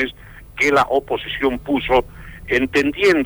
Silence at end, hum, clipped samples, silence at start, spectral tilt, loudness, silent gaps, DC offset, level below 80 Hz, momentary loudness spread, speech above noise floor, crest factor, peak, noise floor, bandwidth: 0 s; none; under 0.1%; 0 s; -4.5 dB/octave; -18 LUFS; none; under 0.1%; -40 dBFS; 12 LU; 21 dB; 14 dB; -4 dBFS; -38 dBFS; over 20 kHz